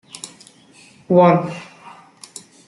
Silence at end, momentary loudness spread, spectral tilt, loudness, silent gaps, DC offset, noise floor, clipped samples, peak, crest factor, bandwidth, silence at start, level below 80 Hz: 1.05 s; 25 LU; -7 dB/octave; -15 LUFS; none; under 0.1%; -48 dBFS; under 0.1%; -2 dBFS; 18 dB; 11.5 kHz; 0.25 s; -64 dBFS